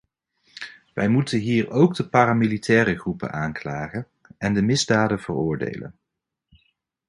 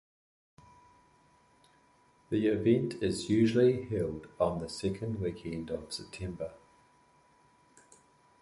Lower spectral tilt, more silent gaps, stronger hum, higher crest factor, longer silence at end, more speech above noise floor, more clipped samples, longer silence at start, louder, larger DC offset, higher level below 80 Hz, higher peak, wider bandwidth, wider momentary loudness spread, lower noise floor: about the same, -6 dB/octave vs -6.5 dB/octave; neither; neither; about the same, 22 dB vs 20 dB; second, 1.15 s vs 1.85 s; first, 61 dB vs 35 dB; neither; second, 0.6 s vs 2.3 s; first, -22 LUFS vs -32 LUFS; neither; first, -52 dBFS vs -58 dBFS; first, -2 dBFS vs -14 dBFS; about the same, 11.5 kHz vs 11.5 kHz; first, 17 LU vs 13 LU; first, -82 dBFS vs -66 dBFS